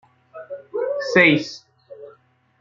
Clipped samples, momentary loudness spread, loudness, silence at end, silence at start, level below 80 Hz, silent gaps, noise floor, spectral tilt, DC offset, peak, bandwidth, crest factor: under 0.1%; 23 LU; -18 LUFS; 0.5 s; 0.35 s; -66 dBFS; none; -56 dBFS; -5.5 dB/octave; under 0.1%; -2 dBFS; 7.6 kHz; 22 dB